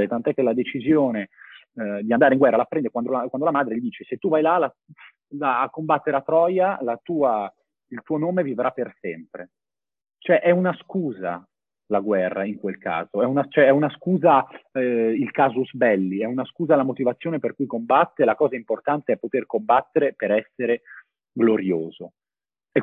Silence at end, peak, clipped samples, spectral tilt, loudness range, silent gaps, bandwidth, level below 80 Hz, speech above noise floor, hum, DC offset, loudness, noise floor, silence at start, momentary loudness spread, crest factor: 0 s; -4 dBFS; under 0.1%; -9.5 dB/octave; 4 LU; none; 4 kHz; -68 dBFS; over 68 dB; none; under 0.1%; -22 LUFS; under -90 dBFS; 0 s; 12 LU; 18 dB